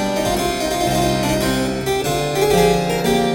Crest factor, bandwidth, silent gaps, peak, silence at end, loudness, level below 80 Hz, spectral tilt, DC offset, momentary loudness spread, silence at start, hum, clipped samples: 16 dB; 17 kHz; none; -2 dBFS; 0 s; -18 LUFS; -34 dBFS; -4.5 dB/octave; under 0.1%; 5 LU; 0 s; none; under 0.1%